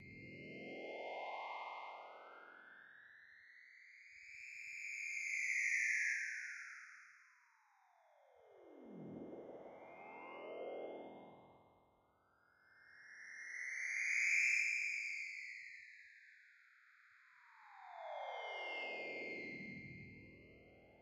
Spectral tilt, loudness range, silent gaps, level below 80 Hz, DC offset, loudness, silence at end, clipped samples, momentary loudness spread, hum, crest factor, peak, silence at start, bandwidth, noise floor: -2 dB/octave; 16 LU; none; -84 dBFS; under 0.1%; -42 LUFS; 0 s; under 0.1%; 25 LU; none; 22 dB; -26 dBFS; 0 s; 12.5 kHz; -76 dBFS